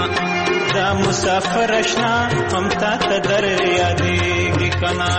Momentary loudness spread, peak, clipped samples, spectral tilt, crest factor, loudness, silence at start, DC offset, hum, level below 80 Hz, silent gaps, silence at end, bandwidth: 2 LU; -6 dBFS; under 0.1%; -4.5 dB/octave; 12 dB; -17 LUFS; 0 s; under 0.1%; none; -40 dBFS; none; 0 s; 8.8 kHz